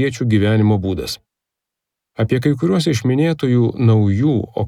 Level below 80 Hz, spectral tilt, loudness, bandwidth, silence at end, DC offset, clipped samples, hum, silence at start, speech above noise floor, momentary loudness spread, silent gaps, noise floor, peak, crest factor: -50 dBFS; -7 dB/octave; -16 LUFS; 13.5 kHz; 0 s; under 0.1%; under 0.1%; none; 0 s; 67 dB; 9 LU; none; -83 dBFS; -4 dBFS; 14 dB